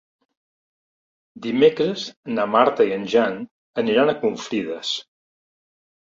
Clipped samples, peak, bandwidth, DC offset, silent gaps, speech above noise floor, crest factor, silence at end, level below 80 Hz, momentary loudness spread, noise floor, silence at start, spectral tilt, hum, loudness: under 0.1%; -2 dBFS; 7.6 kHz; under 0.1%; 2.17-2.23 s, 3.51-3.74 s; over 70 dB; 22 dB; 1.15 s; -66 dBFS; 11 LU; under -90 dBFS; 1.35 s; -5 dB/octave; none; -21 LUFS